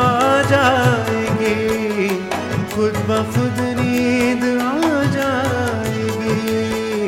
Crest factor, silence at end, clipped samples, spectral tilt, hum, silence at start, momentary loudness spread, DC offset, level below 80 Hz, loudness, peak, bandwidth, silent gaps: 14 dB; 0 s; under 0.1%; -5.5 dB/octave; none; 0 s; 7 LU; under 0.1%; -46 dBFS; -18 LUFS; -2 dBFS; 17 kHz; none